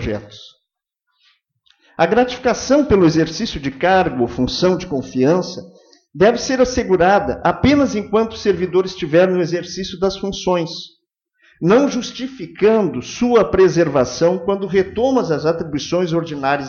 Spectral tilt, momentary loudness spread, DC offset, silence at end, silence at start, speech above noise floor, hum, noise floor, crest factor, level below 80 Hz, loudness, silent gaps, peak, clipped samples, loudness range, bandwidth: -5.5 dB/octave; 10 LU; under 0.1%; 0 s; 0 s; 61 dB; none; -77 dBFS; 16 dB; -42 dBFS; -17 LUFS; none; 0 dBFS; under 0.1%; 3 LU; 7.2 kHz